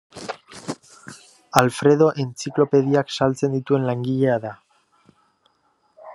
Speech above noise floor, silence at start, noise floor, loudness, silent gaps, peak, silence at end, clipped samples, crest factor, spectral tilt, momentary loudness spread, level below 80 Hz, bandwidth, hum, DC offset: 46 dB; 0.15 s; -65 dBFS; -20 LUFS; none; 0 dBFS; 0 s; under 0.1%; 22 dB; -6 dB/octave; 18 LU; -60 dBFS; 12.5 kHz; none; under 0.1%